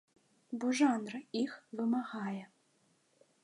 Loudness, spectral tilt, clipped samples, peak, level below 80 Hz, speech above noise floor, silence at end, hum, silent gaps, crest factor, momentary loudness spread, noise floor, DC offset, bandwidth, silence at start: -36 LUFS; -4.5 dB/octave; under 0.1%; -16 dBFS; -90 dBFS; 38 dB; 1 s; none; none; 20 dB; 11 LU; -73 dBFS; under 0.1%; 11 kHz; 0.5 s